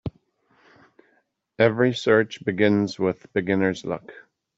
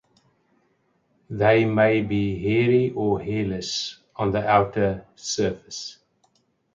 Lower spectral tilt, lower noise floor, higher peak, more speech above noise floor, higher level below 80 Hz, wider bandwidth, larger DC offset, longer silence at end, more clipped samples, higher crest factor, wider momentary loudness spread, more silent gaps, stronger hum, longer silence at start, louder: about the same, -6.5 dB/octave vs -5.5 dB/octave; about the same, -67 dBFS vs -67 dBFS; about the same, -4 dBFS vs -6 dBFS; about the same, 45 dB vs 45 dB; second, -58 dBFS vs -50 dBFS; about the same, 8 kHz vs 7.6 kHz; neither; second, 0.4 s vs 0.85 s; neither; about the same, 20 dB vs 18 dB; about the same, 12 LU vs 14 LU; neither; neither; second, 0.05 s vs 1.3 s; about the same, -23 LUFS vs -23 LUFS